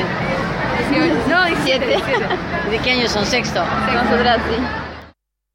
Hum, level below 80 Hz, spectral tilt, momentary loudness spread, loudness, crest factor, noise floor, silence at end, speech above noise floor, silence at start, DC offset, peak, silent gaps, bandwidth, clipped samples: none; -36 dBFS; -4.5 dB/octave; 6 LU; -17 LUFS; 14 dB; -48 dBFS; 0.45 s; 31 dB; 0 s; under 0.1%; -4 dBFS; none; 16.5 kHz; under 0.1%